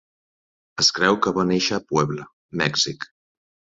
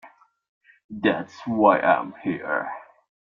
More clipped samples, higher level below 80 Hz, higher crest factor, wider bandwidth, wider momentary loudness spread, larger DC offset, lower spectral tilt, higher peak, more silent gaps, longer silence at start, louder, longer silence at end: neither; first, -56 dBFS vs -70 dBFS; about the same, 22 dB vs 22 dB; about the same, 7.8 kHz vs 7.2 kHz; about the same, 17 LU vs 16 LU; neither; second, -3.5 dB/octave vs -7 dB/octave; about the same, -2 dBFS vs -4 dBFS; about the same, 2.33-2.49 s vs 0.48-0.61 s, 0.84-0.89 s; first, 0.75 s vs 0.05 s; about the same, -21 LUFS vs -23 LUFS; about the same, 0.65 s vs 0.55 s